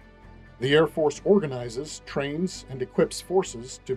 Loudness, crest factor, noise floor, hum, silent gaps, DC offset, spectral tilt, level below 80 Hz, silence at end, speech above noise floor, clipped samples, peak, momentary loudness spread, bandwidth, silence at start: -26 LUFS; 18 dB; -48 dBFS; none; none; under 0.1%; -5 dB/octave; -52 dBFS; 0 s; 23 dB; under 0.1%; -8 dBFS; 13 LU; 13.5 kHz; 0.25 s